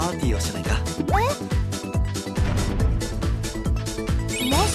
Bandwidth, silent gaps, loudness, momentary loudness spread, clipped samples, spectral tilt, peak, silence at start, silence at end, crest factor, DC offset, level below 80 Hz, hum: 14 kHz; none; -25 LUFS; 4 LU; under 0.1%; -5 dB/octave; -8 dBFS; 0 s; 0 s; 14 dB; under 0.1%; -28 dBFS; none